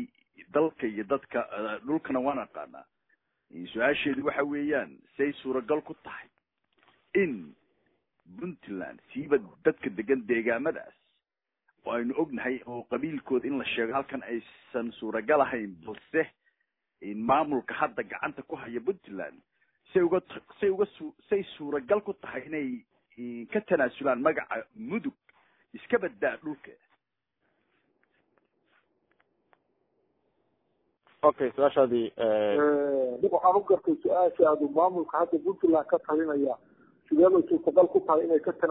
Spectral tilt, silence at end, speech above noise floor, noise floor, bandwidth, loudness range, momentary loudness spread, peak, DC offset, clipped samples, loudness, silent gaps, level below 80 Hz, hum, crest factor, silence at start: -9.5 dB/octave; 0 s; 59 dB; -87 dBFS; 4 kHz; 9 LU; 16 LU; -8 dBFS; under 0.1%; under 0.1%; -28 LUFS; none; -70 dBFS; none; 22 dB; 0 s